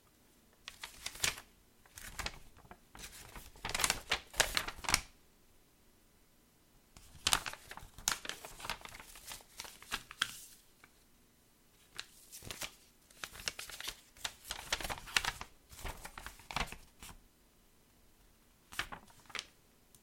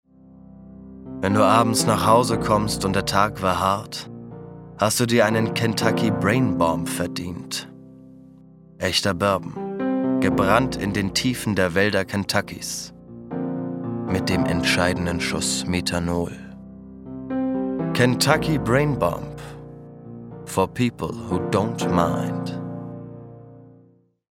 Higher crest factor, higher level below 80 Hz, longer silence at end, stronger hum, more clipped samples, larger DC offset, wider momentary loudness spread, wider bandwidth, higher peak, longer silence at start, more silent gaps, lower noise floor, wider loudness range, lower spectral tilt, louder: first, 38 dB vs 22 dB; second, -56 dBFS vs -46 dBFS; second, 0.05 s vs 0.6 s; neither; neither; neither; about the same, 20 LU vs 20 LU; about the same, 16.5 kHz vs 16.5 kHz; second, -6 dBFS vs 0 dBFS; about the same, 0.6 s vs 0.5 s; neither; first, -67 dBFS vs -56 dBFS; first, 10 LU vs 5 LU; second, -0.5 dB/octave vs -5 dB/octave; second, -39 LUFS vs -22 LUFS